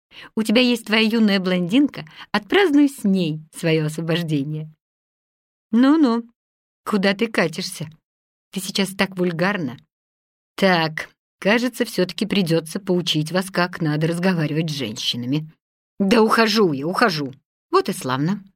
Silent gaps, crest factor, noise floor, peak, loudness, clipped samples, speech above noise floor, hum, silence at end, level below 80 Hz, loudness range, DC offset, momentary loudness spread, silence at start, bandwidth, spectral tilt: 4.81-5.70 s, 6.35-6.84 s, 8.04-8.51 s, 9.92-10.56 s, 11.18-11.38 s, 15.60-15.97 s, 17.45-17.70 s; 18 dB; under -90 dBFS; -4 dBFS; -20 LUFS; under 0.1%; over 70 dB; none; 0.15 s; -62 dBFS; 4 LU; under 0.1%; 13 LU; 0.15 s; 16.5 kHz; -5.5 dB/octave